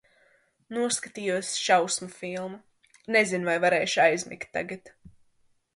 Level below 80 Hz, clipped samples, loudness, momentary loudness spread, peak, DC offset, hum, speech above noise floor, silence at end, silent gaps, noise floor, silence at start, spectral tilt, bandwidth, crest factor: -68 dBFS; under 0.1%; -26 LUFS; 13 LU; -8 dBFS; under 0.1%; none; 40 dB; 0.65 s; none; -67 dBFS; 0.7 s; -2.5 dB/octave; 11.5 kHz; 20 dB